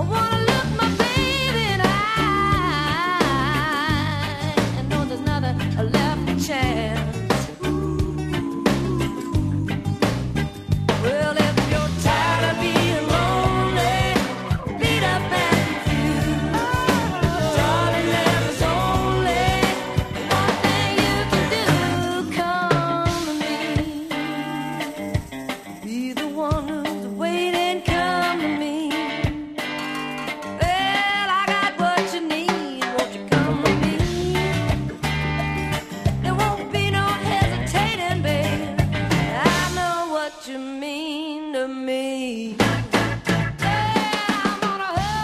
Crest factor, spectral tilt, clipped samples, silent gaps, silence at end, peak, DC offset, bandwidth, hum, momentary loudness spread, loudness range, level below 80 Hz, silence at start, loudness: 20 dB; -5 dB/octave; under 0.1%; none; 0 s; -2 dBFS; under 0.1%; 14.5 kHz; none; 7 LU; 4 LU; -36 dBFS; 0 s; -22 LUFS